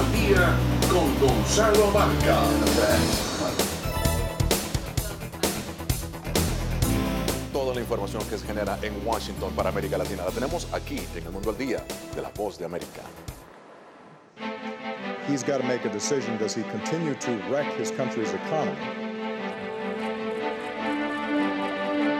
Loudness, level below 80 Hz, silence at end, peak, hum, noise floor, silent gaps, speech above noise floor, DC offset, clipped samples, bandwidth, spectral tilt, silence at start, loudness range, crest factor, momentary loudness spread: -26 LUFS; -36 dBFS; 0 s; -8 dBFS; none; -49 dBFS; none; 24 dB; under 0.1%; under 0.1%; 17.5 kHz; -4.5 dB/octave; 0 s; 11 LU; 18 dB; 12 LU